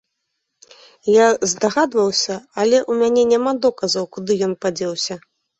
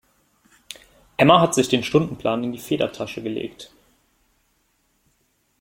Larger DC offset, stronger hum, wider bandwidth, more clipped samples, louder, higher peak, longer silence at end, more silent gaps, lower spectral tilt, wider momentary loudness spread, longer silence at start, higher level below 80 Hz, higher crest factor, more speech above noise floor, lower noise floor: neither; neither; second, 8.2 kHz vs 16.5 kHz; neither; about the same, -18 LUFS vs -20 LUFS; about the same, -2 dBFS vs -2 dBFS; second, 0.4 s vs 1.95 s; neither; second, -3.5 dB/octave vs -5 dB/octave; second, 9 LU vs 25 LU; second, 1.05 s vs 1.2 s; about the same, -62 dBFS vs -58 dBFS; second, 16 dB vs 22 dB; first, 58 dB vs 47 dB; first, -75 dBFS vs -67 dBFS